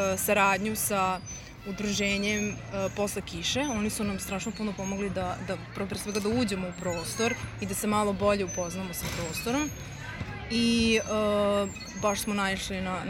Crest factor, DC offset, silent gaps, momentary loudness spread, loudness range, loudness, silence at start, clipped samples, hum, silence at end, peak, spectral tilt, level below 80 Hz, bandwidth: 20 dB; under 0.1%; none; 10 LU; 3 LU; -29 LUFS; 0 s; under 0.1%; none; 0 s; -10 dBFS; -4 dB/octave; -48 dBFS; 16.5 kHz